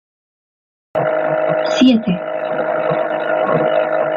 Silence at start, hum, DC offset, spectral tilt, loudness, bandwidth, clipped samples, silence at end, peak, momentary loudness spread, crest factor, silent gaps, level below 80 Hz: 0.95 s; none; under 0.1%; -6 dB/octave; -16 LUFS; 7.4 kHz; under 0.1%; 0 s; -2 dBFS; 8 LU; 14 dB; none; -58 dBFS